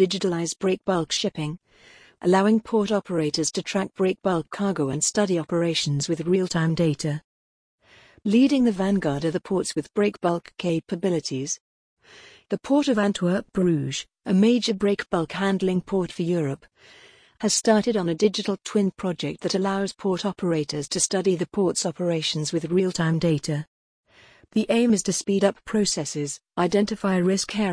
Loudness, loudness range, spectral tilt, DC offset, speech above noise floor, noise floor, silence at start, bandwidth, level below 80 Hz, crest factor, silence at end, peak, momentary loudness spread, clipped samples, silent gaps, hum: -24 LUFS; 2 LU; -5 dB/octave; under 0.1%; 30 dB; -53 dBFS; 0 s; 10.5 kHz; -58 dBFS; 18 dB; 0 s; -6 dBFS; 8 LU; under 0.1%; 7.24-7.78 s, 11.60-11.97 s, 23.68-24.03 s; none